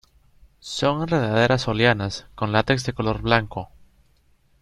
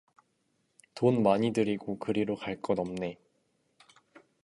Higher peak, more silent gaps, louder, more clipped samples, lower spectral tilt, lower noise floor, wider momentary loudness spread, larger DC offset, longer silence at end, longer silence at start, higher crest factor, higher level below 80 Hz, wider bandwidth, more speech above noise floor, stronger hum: first, -2 dBFS vs -10 dBFS; neither; first, -22 LUFS vs -30 LUFS; neither; second, -5.5 dB/octave vs -7 dB/octave; second, -60 dBFS vs -75 dBFS; first, 14 LU vs 11 LU; neither; second, 0.95 s vs 1.3 s; second, 0.65 s vs 0.95 s; about the same, 22 dB vs 22 dB; first, -46 dBFS vs -66 dBFS; about the same, 11.5 kHz vs 11.5 kHz; second, 38 dB vs 46 dB; neither